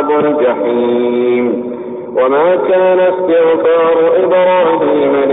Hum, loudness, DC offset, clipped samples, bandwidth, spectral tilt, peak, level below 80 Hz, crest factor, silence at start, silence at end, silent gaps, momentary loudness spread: none; -11 LUFS; 0.1%; under 0.1%; 4 kHz; -11.5 dB/octave; -4 dBFS; -58 dBFS; 8 dB; 0 s; 0 s; none; 5 LU